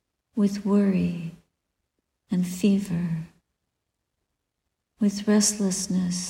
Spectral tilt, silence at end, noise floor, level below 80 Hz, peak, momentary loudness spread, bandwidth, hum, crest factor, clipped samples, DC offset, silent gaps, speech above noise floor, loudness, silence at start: -5 dB/octave; 0 s; -81 dBFS; -60 dBFS; -10 dBFS; 13 LU; 16 kHz; none; 16 dB; under 0.1%; under 0.1%; none; 57 dB; -25 LUFS; 0.35 s